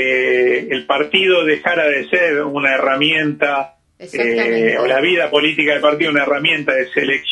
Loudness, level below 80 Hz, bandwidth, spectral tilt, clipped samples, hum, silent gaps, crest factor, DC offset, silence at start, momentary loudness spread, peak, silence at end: -15 LUFS; -62 dBFS; 10.5 kHz; -5 dB/octave; under 0.1%; none; none; 16 dB; under 0.1%; 0 s; 4 LU; 0 dBFS; 0 s